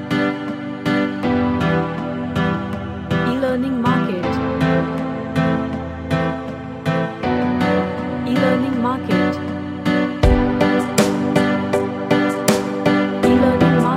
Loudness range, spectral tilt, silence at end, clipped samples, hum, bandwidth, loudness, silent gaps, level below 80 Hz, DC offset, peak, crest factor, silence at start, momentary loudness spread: 4 LU; -6.5 dB/octave; 0 s; under 0.1%; none; 16 kHz; -19 LUFS; none; -34 dBFS; under 0.1%; 0 dBFS; 18 dB; 0 s; 8 LU